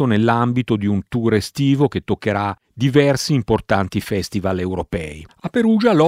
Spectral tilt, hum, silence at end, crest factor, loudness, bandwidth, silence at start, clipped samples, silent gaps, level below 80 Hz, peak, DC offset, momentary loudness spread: -6.5 dB/octave; none; 0 s; 16 dB; -19 LUFS; 16 kHz; 0 s; under 0.1%; none; -44 dBFS; 0 dBFS; under 0.1%; 8 LU